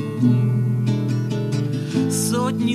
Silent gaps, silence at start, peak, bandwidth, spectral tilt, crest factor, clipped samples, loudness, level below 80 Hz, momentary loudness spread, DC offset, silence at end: none; 0 s; -6 dBFS; 14 kHz; -6.5 dB/octave; 14 dB; under 0.1%; -21 LUFS; -60 dBFS; 5 LU; under 0.1%; 0 s